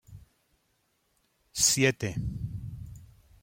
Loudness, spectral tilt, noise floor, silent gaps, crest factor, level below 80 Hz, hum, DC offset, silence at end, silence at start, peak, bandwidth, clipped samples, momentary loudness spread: -27 LUFS; -3 dB/octave; -73 dBFS; none; 24 dB; -50 dBFS; none; under 0.1%; 0.4 s; 0.1 s; -10 dBFS; 16.5 kHz; under 0.1%; 21 LU